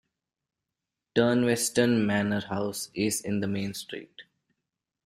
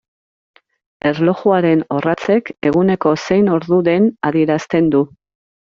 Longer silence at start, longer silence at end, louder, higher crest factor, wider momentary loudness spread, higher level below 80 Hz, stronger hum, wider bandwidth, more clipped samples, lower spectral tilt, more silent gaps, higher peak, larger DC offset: about the same, 1.15 s vs 1.05 s; first, 0.85 s vs 0.7 s; second, -27 LUFS vs -15 LUFS; first, 20 dB vs 14 dB; first, 11 LU vs 4 LU; second, -64 dBFS vs -54 dBFS; neither; first, 15.5 kHz vs 7.4 kHz; neither; second, -4.5 dB/octave vs -6.5 dB/octave; neither; second, -8 dBFS vs -2 dBFS; neither